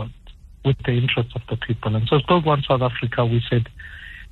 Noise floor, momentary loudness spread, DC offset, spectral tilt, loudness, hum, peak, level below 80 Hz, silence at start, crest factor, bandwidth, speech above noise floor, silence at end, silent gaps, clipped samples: -43 dBFS; 15 LU; under 0.1%; -9 dB/octave; -21 LUFS; none; -6 dBFS; -42 dBFS; 0 s; 16 dB; 4.3 kHz; 23 dB; 0.05 s; none; under 0.1%